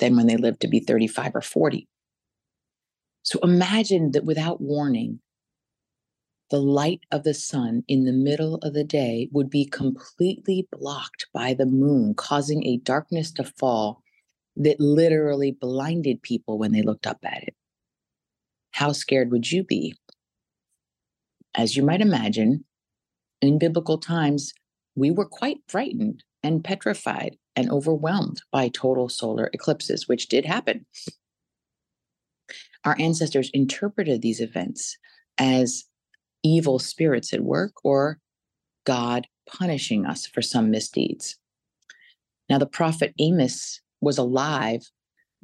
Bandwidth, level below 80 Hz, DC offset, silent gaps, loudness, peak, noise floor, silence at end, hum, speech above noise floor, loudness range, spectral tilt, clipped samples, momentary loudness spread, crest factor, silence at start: 12.5 kHz; -70 dBFS; under 0.1%; none; -24 LUFS; -6 dBFS; -89 dBFS; 0.65 s; none; 66 dB; 4 LU; -5.5 dB/octave; under 0.1%; 11 LU; 18 dB; 0 s